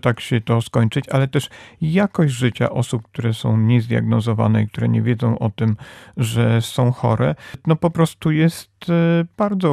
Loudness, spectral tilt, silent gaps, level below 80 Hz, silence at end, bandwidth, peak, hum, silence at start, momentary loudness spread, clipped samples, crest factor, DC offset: -19 LUFS; -7 dB/octave; none; -52 dBFS; 0 s; 14 kHz; -2 dBFS; none; 0.05 s; 7 LU; under 0.1%; 16 dB; under 0.1%